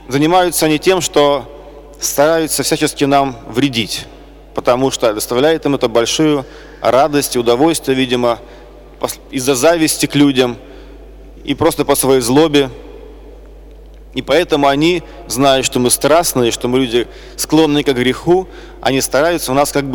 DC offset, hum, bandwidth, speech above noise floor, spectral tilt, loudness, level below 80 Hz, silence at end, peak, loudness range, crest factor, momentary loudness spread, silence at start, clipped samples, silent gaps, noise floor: under 0.1%; none; 19.5 kHz; 22 dB; -4 dB/octave; -14 LUFS; -38 dBFS; 0 s; -2 dBFS; 3 LU; 12 dB; 11 LU; 0.1 s; under 0.1%; none; -36 dBFS